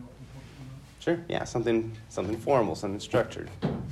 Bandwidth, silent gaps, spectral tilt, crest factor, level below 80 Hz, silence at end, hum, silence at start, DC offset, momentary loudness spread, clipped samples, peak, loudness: 13 kHz; none; -6 dB/octave; 18 dB; -54 dBFS; 0 s; none; 0 s; under 0.1%; 20 LU; under 0.1%; -12 dBFS; -30 LUFS